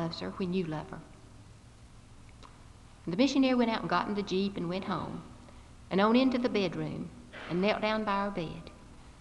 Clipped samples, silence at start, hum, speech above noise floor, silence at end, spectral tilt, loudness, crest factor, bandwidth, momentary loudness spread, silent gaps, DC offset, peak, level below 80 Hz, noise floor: under 0.1%; 0 s; 60 Hz at -55 dBFS; 23 dB; 0 s; -6 dB/octave; -31 LUFS; 20 dB; 11 kHz; 19 LU; none; under 0.1%; -12 dBFS; -56 dBFS; -53 dBFS